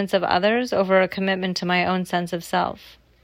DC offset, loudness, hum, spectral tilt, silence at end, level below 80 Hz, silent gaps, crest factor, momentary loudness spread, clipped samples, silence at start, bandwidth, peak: under 0.1%; -22 LUFS; none; -5.5 dB/octave; 0.35 s; -58 dBFS; none; 16 dB; 6 LU; under 0.1%; 0 s; 15.5 kHz; -6 dBFS